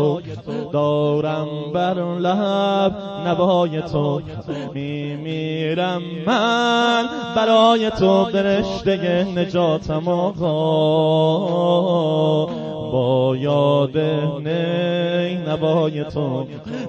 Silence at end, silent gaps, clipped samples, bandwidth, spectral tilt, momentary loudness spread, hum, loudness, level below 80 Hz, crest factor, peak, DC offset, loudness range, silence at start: 0 s; none; under 0.1%; 8.4 kHz; -7 dB/octave; 9 LU; none; -19 LUFS; -50 dBFS; 16 dB; -4 dBFS; under 0.1%; 4 LU; 0 s